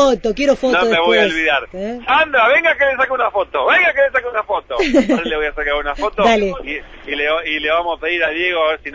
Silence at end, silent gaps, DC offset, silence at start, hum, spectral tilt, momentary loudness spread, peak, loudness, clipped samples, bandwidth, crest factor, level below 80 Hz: 0 s; none; under 0.1%; 0 s; none; -4 dB/octave; 9 LU; -2 dBFS; -15 LUFS; under 0.1%; 8 kHz; 12 dB; -40 dBFS